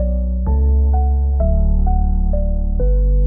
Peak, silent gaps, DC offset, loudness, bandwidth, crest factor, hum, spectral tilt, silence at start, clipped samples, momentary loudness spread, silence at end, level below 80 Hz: -4 dBFS; none; 0.4%; -18 LUFS; 1.6 kHz; 10 dB; none; -15.5 dB/octave; 0 s; under 0.1%; 4 LU; 0 s; -14 dBFS